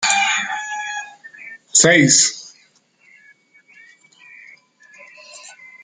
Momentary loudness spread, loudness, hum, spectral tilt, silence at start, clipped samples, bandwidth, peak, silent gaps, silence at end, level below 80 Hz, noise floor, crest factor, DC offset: 27 LU; -14 LUFS; none; -2 dB/octave; 0 s; under 0.1%; 10.5 kHz; 0 dBFS; none; 0.3 s; -64 dBFS; -56 dBFS; 20 dB; under 0.1%